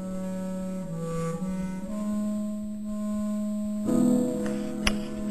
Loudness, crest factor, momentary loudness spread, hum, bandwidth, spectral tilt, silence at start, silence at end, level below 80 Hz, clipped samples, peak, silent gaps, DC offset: -30 LUFS; 24 dB; 9 LU; none; 13.5 kHz; -6 dB/octave; 0 s; 0 s; -48 dBFS; under 0.1%; -4 dBFS; none; 0.7%